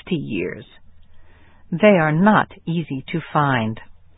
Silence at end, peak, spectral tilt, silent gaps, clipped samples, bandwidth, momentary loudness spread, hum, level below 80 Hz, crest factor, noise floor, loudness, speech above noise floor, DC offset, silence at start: 0.25 s; 0 dBFS; -12 dB/octave; none; under 0.1%; 4 kHz; 15 LU; none; -52 dBFS; 20 dB; -44 dBFS; -19 LUFS; 26 dB; under 0.1%; 0.05 s